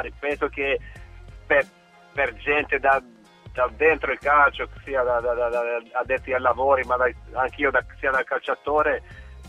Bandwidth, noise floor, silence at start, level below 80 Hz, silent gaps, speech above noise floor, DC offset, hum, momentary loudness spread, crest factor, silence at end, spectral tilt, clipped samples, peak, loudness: 11 kHz; -42 dBFS; 0 s; -44 dBFS; none; 19 dB; under 0.1%; none; 8 LU; 18 dB; 0 s; -5.5 dB/octave; under 0.1%; -6 dBFS; -23 LUFS